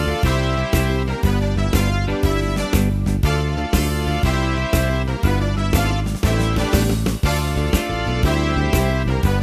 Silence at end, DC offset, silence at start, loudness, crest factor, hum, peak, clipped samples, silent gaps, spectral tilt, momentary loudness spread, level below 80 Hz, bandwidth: 0 s; under 0.1%; 0 s; -19 LUFS; 14 dB; none; -4 dBFS; under 0.1%; none; -6 dB/octave; 2 LU; -24 dBFS; 15.5 kHz